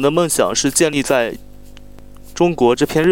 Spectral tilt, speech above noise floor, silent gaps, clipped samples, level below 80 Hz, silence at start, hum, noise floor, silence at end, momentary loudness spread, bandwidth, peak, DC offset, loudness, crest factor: -4 dB/octave; 21 dB; none; under 0.1%; -42 dBFS; 0 s; 50 Hz at -45 dBFS; -36 dBFS; 0 s; 9 LU; 17 kHz; -2 dBFS; under 0.1%; -16 LUFS; 16 dB